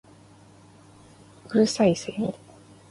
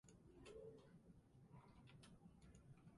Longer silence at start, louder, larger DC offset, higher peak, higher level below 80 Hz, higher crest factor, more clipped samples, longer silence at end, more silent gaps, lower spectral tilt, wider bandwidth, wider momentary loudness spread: first, 1.5 s vs 0.05 s; first, -24 LUFS vs -66 LUFS; neither; first, -8 dBFS vs -50 dBFS; first, -62 dBFS vs -76 dBFS; about the same, 20 dB vs 16 dB; neither; first, 0.6 s vs 0 s; neither; about the same, -5.5 dB/octave vs -6 dB/octave; about the same, 11.5 kHz vs 11 kHz; first, 11 LU vs 7 LU